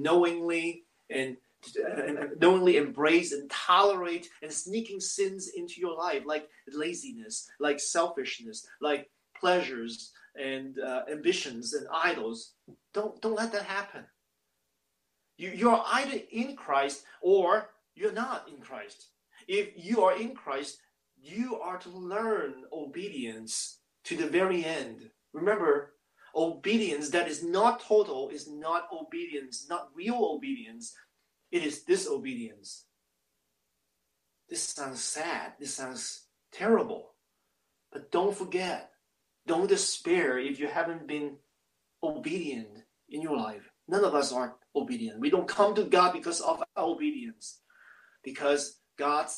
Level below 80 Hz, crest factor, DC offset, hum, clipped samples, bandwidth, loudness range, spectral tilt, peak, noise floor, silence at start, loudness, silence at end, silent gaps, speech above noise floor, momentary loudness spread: -78 dBFS; 22 dB; under 0.1%; none; under 0.1%; 12.5 kHz; 8 LU; -3 dB/octave; -8 dBFS; -80 dBFS; 0 s; -30 LUFS; 0 s; none; 50 dB; 17 LU